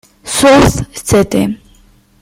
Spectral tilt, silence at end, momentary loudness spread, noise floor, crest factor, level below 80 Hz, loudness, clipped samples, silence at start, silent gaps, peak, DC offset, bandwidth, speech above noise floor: -4.5 dB/octave; 0.65 s; 13 LU; -46 dBFS; 12 dB; -30 dBFS; -11 LUFS; under 0.1%; 0.25 s; none; 0 dBFS; under 0.1%; 16.5 kHz; 37 dB